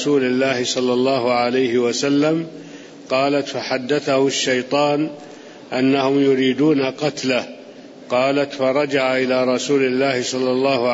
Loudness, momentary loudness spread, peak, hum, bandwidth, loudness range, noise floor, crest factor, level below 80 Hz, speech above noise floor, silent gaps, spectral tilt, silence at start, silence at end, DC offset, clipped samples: -18 LUFS; 8 LU; -6 dBFS; none; 8 kHz; 1 LU; -39 dBFS; 12 dB; -68 dBFS; 21 dB; none; -4.5 dB/octave; 0 s; 0 s; under 0.1%; under 0.1%